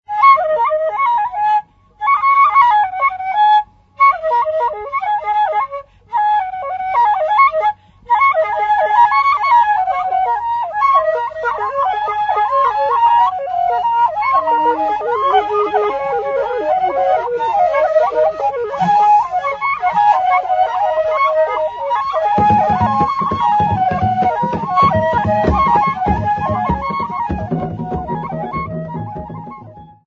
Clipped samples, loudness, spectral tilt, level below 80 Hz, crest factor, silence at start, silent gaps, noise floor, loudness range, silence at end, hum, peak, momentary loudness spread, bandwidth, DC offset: under 0.1%; -15 LUFS; -7 dB/octave; -40 dBFS; 14 dB; 0.1 s; none; -37 dBFS; 3 LU; 0.2 s; none; 0 dBFS; 9 LU; 7.2 kHz; under 0.1%